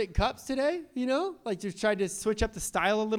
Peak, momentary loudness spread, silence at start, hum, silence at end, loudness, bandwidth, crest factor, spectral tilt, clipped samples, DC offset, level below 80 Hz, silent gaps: -12 dBFS; 6 LU; 0 s; none; 0 s; -30 LUFS; 17 kHz; 16 dB; -4.5 dB/octave; under 0.1%; under 0.1%; -42 dBFS; none